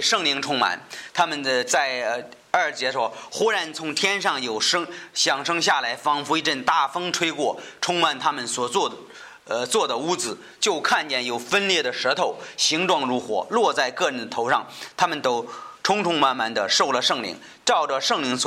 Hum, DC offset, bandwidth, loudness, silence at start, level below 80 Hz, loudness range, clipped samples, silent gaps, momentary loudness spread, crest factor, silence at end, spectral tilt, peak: none; under 0.1%; 16 kHz; -22 LUFS; 0 s; -70 dBFS; 2 LU; under 0.1%; none; 7 LU; 20 dB; 0 s; -1.5 dB/octave; -4 dBFS